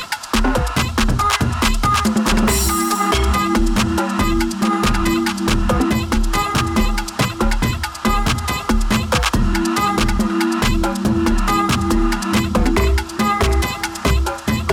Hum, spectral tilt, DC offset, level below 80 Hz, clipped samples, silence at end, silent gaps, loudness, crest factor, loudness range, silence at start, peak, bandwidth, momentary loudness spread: none; -4.5 dB/octave; under 0.1%; -22 dBFS; under 0.1%; 0 s; none; -18 LUFS; 14 dB; 2 LU; 0 s; -2 dBFS; 19 kHz; 3 LU